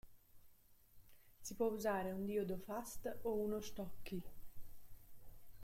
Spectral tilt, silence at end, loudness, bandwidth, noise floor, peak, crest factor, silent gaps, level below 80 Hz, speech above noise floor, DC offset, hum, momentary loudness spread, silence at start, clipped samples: -5.5 dB/octave; 0 s; -44 LUFS; 16.5 kHz; -66 dBFS; -26 dBFS; 18 dB; none; -62 dBFS; 24 dB; under 0.1%; none; 22 LU; 0.05 s; under 0.1%